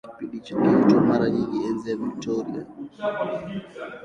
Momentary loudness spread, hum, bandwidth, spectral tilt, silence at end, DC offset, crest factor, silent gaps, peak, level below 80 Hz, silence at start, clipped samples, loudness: 17 LU; none; 8 kHz; -7.5 dB/octave; 0 s; under 0.1%; 18 dB; none; -6 dBFS; -58 dBFS; 0.05 s; under 0.1%; -23 LUFS